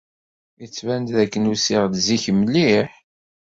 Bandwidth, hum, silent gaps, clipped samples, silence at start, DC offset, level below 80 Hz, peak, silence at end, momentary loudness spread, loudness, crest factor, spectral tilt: 7.8 kHz; none; none; under 0.1%; 0.6 s; under 0.1%; -54 dBFS; -4 dBFS; 0.5 s; 11 LU; -19 LUFS; 16 dB; -4.5 dB/octave